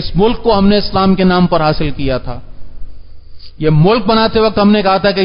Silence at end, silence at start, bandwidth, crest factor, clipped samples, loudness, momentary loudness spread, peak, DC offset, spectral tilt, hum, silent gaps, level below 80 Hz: 0 s; 0 s; 5.4 kHz; 12 dB; under 0.1%; -12 LUFS; 8 LU; 0 dBFS; under 0.1%; -11 dB/octave; none; none; -28 dBFS